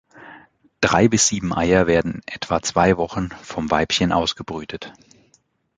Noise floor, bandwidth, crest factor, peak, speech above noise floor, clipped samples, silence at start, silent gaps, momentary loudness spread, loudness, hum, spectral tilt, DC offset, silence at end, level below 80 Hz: -62 dBFS; 9.6 kHz; 20 dB; -2 dBFS; 42 dB; under 0.1%; 0.15 s; none; 14 LU; -20 LUFS; none; -4 dB/octave; under 0.1%; 0.85 s; -42 dBFS